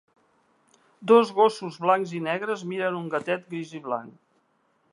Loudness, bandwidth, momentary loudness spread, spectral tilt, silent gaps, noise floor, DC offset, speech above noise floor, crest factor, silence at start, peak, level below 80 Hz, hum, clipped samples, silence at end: -25 LUFS; 11 kHz; 14 LU; -6 dB/octave; none; -68 dBFS; under 0.1%; 44 dB; 22 dB; 1 s; -4 dBFS; -80 dBFS; none; under 0.1%; 0.85 s